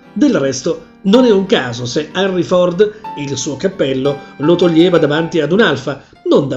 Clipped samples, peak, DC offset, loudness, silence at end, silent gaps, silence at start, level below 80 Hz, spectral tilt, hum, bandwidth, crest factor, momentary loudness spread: under 0.1%; 0 dBFS; under 0.1%; -14 LUFS; 0 s; none; 0.15 s; -50 dBFS; -5.5 dB/octave; none; 8.2 kHz; 14 dB; 10 LU